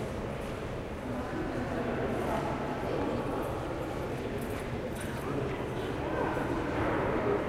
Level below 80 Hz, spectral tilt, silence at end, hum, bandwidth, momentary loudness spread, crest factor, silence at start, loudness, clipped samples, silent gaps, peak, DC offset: -46 dBFS; -6.5 dB/octave; 0 s; none; 16 kHz; 6 LU; 16 dB; 0 s; -34 LUFS; under 0.1%; none; -18 dBFS; under 0.1%